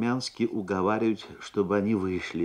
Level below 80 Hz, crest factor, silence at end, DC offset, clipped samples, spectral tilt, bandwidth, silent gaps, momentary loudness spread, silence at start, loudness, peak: -62 dBFS; 16 dB; 0 s; under 0.1%; under 0.1%; -6 dB/octave; 11 kHz; none; 5 LU; 0 s; -28 LUFS; -12 dBFS